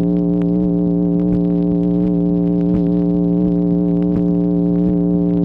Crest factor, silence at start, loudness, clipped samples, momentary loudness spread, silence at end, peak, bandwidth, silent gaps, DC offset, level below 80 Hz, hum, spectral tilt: 10 dB; 0 s; -16 LUFS; under 0.1%; 1 LU; 0 s; -4 dBFS; 2.4 kHz; none; under 0.1%; -34 dBFS; none; -13 dB/octave